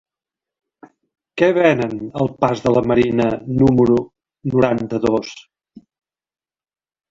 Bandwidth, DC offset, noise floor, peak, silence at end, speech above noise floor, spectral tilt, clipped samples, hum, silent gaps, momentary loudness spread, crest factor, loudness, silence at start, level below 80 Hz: 7.6 kHz; under 0.1%; under -90 dBFS; 0 dBFS; 1.7 s; over 74 dB; -7.5 dB/octave; under 0.1%; none; none; 10 LU; 18 dB; -17 LUFS; 1.35 s; -46 dBFS